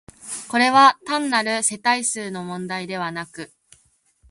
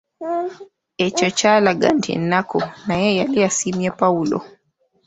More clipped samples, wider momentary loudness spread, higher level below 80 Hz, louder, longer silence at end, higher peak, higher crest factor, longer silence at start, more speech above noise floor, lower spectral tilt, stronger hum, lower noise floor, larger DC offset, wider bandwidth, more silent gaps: neither; first, 18 LU vs 10 LU; second, -64 dBFS vs -56 dBFS; about the same, -20 LUFS vs -19 LUFS; first, 0.85 s vs 0.6 s; about the same, -2 dBFS vs -2 dBFS; about the same, 20 dB vs 18 dB; about the same, 0.25 s vs 0.2 s; second, 41 dB vs 46 dB; second, -2 dB/octave vs -4 dB/octave; neither; about the same, -61 dBFS vs -64 dBFS; neither; first, 11.5 kHz vs 8.4 kHz; neither